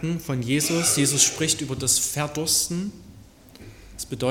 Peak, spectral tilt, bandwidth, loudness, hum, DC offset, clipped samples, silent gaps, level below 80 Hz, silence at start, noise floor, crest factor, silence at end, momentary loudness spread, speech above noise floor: -2 dBFS; -3 dB/octave; 17.5 kHz; -21 LUFS; none; under 0.1%; under 0.1%; none; -50 dBFS; 0 s; -48 dBFS; 22 dB; 0 s; 12 LU; 24 dB